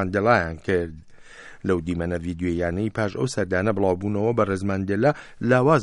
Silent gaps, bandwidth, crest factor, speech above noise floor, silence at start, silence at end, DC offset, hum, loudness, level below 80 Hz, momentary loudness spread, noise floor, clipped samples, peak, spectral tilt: none; 11.5 kHz; 20 dB; 21 dB; 0 s; 0 s; under 0.1%; none; -23 LUFS; -48 dBFS; 7 LU; -44 dBFS; under 0.1%; -4 dBFS; -7 dB/octave